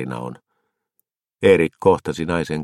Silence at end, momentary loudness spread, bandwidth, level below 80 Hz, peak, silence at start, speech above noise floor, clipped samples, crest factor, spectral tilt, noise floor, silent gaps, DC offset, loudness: 0 s; 15 LU; 12 kHz; -50 dBFS; -2 dBFS; 0 s; 55 dB; under 0.1%; 20 dB; -6.5 dB/octave; -74 dBFS; none; under 0.1%; -18 LUFS